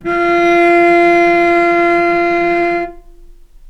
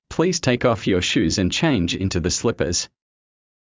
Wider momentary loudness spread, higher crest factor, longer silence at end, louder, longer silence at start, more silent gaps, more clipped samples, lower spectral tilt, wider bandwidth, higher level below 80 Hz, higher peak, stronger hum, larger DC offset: first, 6 LU vs 3 LU; about the same, 12 dB vs 16 dB; second, 0.4 s vs 0.9 s; first, -11 LUFS vs -20 LUFS; about the same, 0 s vs 0.1 s; neither; neither; about the same, -5.5 dB/octave vs -4.5 dB/octave; about the same, 8 kHz vs 7.8 kHz; about the same, -40 dBFS vs -38 dBFS; first, 0 dBFS vs -6 dBFS; neither; neither